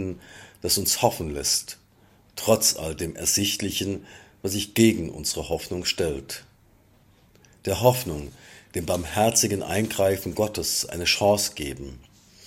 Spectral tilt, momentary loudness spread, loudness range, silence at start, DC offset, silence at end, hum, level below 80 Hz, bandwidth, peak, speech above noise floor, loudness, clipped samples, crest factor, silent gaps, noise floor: -3 dB/octave; 15 LU; 4 LU; 0 s; under 0.1%; 0.45 s; none; -48 dBFS; 16.5 kHz; -4 dBFS; 33 dB; -24 LUFS; under 0.1%; 22 dB; none; -58 dBFS